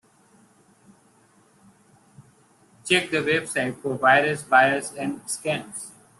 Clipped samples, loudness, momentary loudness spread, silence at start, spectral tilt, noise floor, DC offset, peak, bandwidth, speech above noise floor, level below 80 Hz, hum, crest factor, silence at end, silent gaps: under 0.1%; -22 LUFS; 13 LU; 2.2 s; -3.5 dB/octave; -59 dBFS; under 0.1%; -4 dBFS; 12.5 kHz; 36 dB; -66 dBFS; none; 20 dB; 0.3 s; none